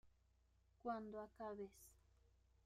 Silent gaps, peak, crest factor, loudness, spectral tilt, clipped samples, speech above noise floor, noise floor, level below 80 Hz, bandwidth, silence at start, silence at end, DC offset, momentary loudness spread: none; -34 dBFS; 20 dB; -52 LUFS; -6 dB/octave; under 0.1%; 27 dB; -78 dBFS; -76 dBFS; 15 kHz; 0.05 s; 0.65 s; under 0.1%; 15 LU